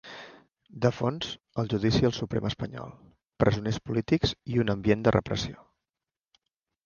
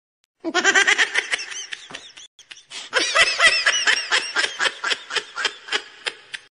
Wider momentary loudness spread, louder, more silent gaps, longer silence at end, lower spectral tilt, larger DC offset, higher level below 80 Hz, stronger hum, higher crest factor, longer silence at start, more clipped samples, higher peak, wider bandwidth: second, 13 LU vs 19 LU; second, -28 LUFS vs -19 LUFS; second, 3.26-3.30 s vs 2.27-2.38 s; first, 1.3 s vs 0.1 s; first, -6.5 dB/octave vs 1 dB/octave; neither; first, -50 dBFS vs -60 dBFS; neither; first, 24 dB vs 18 dB; second, 0.05 s vs 0.45 s; neither; about the same, -6 dBFS vs -4 dBFS; second, 7.2 kHz vs 10.5 kHz